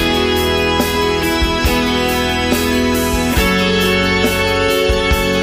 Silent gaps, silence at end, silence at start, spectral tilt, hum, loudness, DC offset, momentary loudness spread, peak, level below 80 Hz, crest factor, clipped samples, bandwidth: none; 0 s; 0 s; -4 dB/octave; none; -14 LUFS; under 0.1%; 2 LU; -2 dBFS; -24 dBFS; 12 dB; under 0.1%; 15.5 kHz